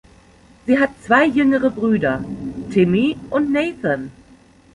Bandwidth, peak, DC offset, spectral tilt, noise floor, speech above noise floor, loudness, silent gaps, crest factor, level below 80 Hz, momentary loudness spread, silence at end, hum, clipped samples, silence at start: 11 kHz; -2 dBFS; under 0.1%; -7 dB/octave; -49 dBFS; 32 dB; -18 LUFS; none; 18 dB; -48 dBFS; 11 LU; 0.65 s; none; under 0.1%; 0.65 s